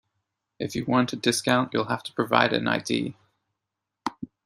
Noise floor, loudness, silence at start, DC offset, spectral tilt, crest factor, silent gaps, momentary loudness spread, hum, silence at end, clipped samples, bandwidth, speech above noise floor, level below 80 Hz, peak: -85 dBFS; -25 LUFS; 0.6 s; under 0.1%; -4.5 dB/octave; 24 dB; none; 14 LU; none; 0.2 s; under 0.1%; 15 kHz; 60 dB; -64 dBFS; -2 dBFS